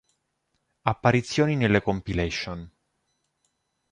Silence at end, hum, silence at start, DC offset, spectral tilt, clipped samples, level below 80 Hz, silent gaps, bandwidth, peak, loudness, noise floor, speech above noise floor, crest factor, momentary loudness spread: 1.25 s; none; 0.85 s; under 0.1%; -6 dB/octave; under 0.1%; -46 dBFS; none; 11 kHz; -4 dBFS; -25 LUFS; -76 dBFS; 52 dB; 22 dB; 9 LU